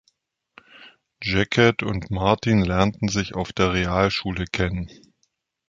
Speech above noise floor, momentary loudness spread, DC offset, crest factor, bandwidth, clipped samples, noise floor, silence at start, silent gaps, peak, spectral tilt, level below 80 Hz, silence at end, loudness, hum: 50 dB; 9 LU; under 0.1%; 22 dB; 7.6 kHz; under 0.1%; -72 dBFS; 0.8 s; none; -2 dBFS; -5.5 dB/octave; -40 dBFS; 0.75 s; -22 LUFS; none